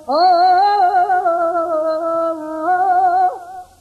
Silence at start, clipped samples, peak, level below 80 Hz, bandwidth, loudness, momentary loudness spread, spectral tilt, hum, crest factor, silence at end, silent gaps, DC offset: 0 s; under 0.1%; -4 dBFS; -60 dBFS; 9.6 kHz; -15 LUFS; 9 LU; -4 dB/octave; none; 10 dB; 0.15 s; none; under 0.1%